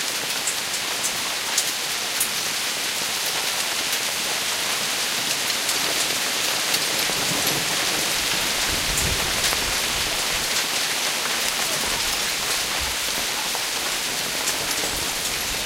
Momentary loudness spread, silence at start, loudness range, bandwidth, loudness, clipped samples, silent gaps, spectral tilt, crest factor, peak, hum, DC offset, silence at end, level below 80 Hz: 3 LU; 0 s; 2 LU; 16 kHz; -21 LUFS; under 0.1%; none; 0 dB/octave; 18 dB; -6 dBFS; none; under 0.1%; 0 s; -46 dBFS